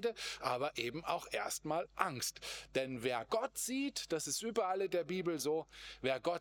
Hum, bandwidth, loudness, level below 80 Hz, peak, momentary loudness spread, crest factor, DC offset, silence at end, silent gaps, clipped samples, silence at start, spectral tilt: none; over 20 kHz; -38 LUFS; -70 dBFS; -14 dBFS; 4 LU; 26 dB; under 0.1%; 0 s; none; under 0.1%; 0 s; -3 dB/octave